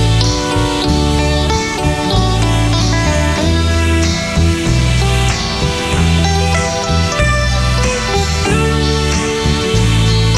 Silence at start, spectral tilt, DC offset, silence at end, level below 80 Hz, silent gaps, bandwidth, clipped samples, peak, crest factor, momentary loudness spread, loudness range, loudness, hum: 0 s; -4.5 dB/octave; under 0.1%; 0 s; -18 dBFS; none; 13.5 kHz; under 0.1%; 0 dBFS; 12 dB; 2 LU; 0 LU; -13 LUFS; none